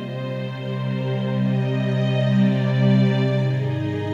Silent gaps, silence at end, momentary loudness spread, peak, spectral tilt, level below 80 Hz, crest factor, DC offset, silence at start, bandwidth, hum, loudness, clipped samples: none; 0 s; 10 LU; -8 dBFS; -8.5 dB/octave; -64 dBFS; 12 dB; under 0.1%; 0 s; 6.8 kHz; none; -21 LUFS; under 0.1%